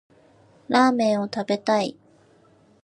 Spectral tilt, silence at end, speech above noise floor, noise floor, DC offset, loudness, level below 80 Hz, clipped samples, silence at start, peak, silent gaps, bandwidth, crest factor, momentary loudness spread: -5 dB/octave; 0.9 s; 36 dB; -57 dBFS; under 0.1%; -22 LUFS; -70 dBFS; under 0.1%; 0.7 s; -4 dBFS; none; 10.5 kHz; 20 dB; 7 LU